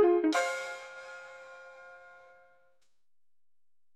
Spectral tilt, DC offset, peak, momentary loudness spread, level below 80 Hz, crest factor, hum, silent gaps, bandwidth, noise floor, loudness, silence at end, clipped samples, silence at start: -2 dB/octave; under 0.1%; -16 dBFS; 24 LU; -86 dBFS; 18 dB; none; none; 13 kHz; under -90 dBFS; -31 LUFS; 2 s; under 0.1%; 0 s